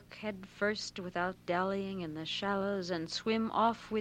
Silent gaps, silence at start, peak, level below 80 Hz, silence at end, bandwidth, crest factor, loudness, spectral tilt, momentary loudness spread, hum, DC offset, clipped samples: none; 0 s; -18 dBFS; -64 dBFS; 0 s; 13 kHz; 18 dB; -35 LUFS; -5 dB/octave; 8 LU; none; under 0.1%; under 0.1%